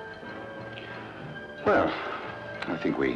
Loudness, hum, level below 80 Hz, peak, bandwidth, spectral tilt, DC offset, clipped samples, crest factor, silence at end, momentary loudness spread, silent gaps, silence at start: -31 LUFS; none; -58 dBFS; -12 dBFS; 9.4 kHz; -7 dB/octave; under 0.1%; under 0.1%; 18 dB; 0 s; 15 LU; none; 0 s